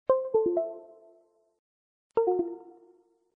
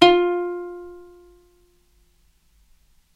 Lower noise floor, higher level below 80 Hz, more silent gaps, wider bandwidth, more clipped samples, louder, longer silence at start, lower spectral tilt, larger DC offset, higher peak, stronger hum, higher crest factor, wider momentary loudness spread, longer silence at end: about the same, -63 dBFS vs -60 dBFS; second, -70 dBFS vs -54 dBFS; first, 1.59-2.10 s vs none; second, 3.3 kHz vs 9.4 kHz; neither; second, -29 LUFS vs -21 LUFS; about the same, 0.1 s vs 0 s; first, -10 dB/octave vs -4.5 dB/octave; neither; second, -12 dBFS vs 0 dBFS; neither; about the same, 20 dB vs 24 dB; second, 16 LU vs 25 LU; second, 0.7 s vs 2.2 s